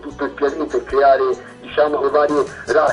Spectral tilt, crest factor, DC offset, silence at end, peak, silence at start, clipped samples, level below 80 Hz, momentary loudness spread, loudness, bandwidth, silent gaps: -5 dB/octave; 14 dB; under 0.1%; 0 s; -4 dBFS; 0 s; under 0.1%; -48 dBFS; 9 LU; -18 LUFS; 10.5 kHz; none